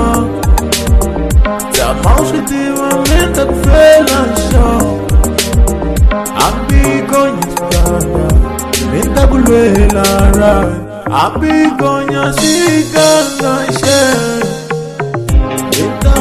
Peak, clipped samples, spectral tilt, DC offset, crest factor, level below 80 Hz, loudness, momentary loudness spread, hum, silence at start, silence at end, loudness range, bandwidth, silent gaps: 0 dBFS; 0.5%; -5 dB/octave; 0.6%; 10 dB; -14 dBFS; -11 LUFS; 6 LU; none; 0 s; 0 s; 2 LU; 14 kHz; none